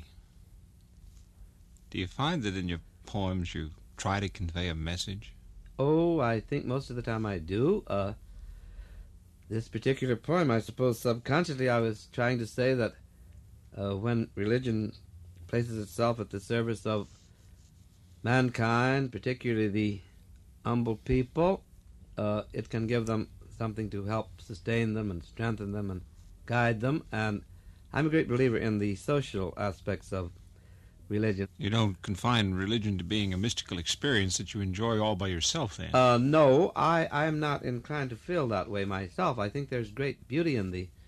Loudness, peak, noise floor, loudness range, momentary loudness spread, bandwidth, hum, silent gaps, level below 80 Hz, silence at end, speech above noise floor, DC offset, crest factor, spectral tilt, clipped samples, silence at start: -31 LUFS; -12 dBFS; -57 dBFS; 8 LU; 11 LU; 13 kHz; none; none; -52 dBFS; 0.05 s; 27 dB; under 0.1%; 20 dB; -5.5 dB/octave; under 0.1%; 0 s